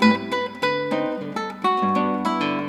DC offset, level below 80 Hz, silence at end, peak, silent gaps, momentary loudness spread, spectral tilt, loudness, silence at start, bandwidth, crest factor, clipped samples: under 0.1%; -64 dBFS; 0 s; -2 dBFS; none; 6 LU; -5.5 dB/octave; -23 LUFS; 0 s; 13 kHz; 20 dB; under 0.1%